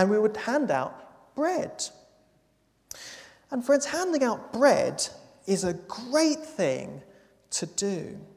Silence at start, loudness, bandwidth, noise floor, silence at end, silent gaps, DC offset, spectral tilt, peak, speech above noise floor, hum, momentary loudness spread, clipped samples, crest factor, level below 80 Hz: 0 s; -27 LUFS; 15 kHz; -68 dBFS; 0.1 s; none; under 0.1%; -4 dB/octave; -6 dBFS; 41 dB; none; 18 LU; under 0.1%; 22 dB; -66 dBFS